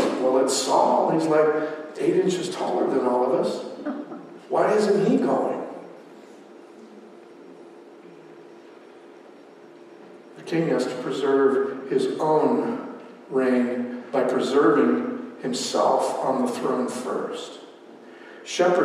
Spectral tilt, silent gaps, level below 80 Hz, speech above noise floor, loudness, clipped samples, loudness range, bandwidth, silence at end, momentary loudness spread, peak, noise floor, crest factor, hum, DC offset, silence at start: -5 dB/octave; none; -80 dBFS; 25 dB; -23 LUFS; under 0.1%; 8 LU; 14.5 kHz; 0 s; 15 LU; -8 dBFS; -47 dBFS; 16 dB; none; under 0.1%; 0 s